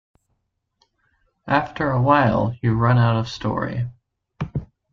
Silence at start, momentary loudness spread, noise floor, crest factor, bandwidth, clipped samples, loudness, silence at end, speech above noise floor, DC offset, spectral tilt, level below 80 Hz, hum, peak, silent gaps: 1.45 s; 13 LU; -73 dBFS; 20 dB; 6.8 kHz; under 0.1%; -21 LUFS; 0.3 s; 54 dB; under 0.1%; -8 dB/octave; -46 dBFS; none; -2 dBFS; none